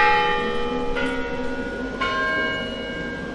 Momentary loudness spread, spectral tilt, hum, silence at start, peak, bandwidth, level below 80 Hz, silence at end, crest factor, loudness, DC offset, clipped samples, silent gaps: 8 LU; -4.5 dB/octave; none; 0 s; -6 dBFS; 11 kHz; -38 dBFS; 0 s; 18 dB; -24 LUFS; under 0.1%; under 0.1%; none